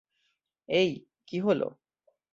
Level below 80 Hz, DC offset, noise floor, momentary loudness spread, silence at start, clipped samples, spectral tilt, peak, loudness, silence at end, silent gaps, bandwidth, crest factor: -72 dBFS; under 0.1%; -77 dBFS; 11 LU; 0.7 s; under 0.1%; -6 dB/octave; -12 dBFS; -29 LUFS; 0.65 s; none; 7.6 kHz; 18 dB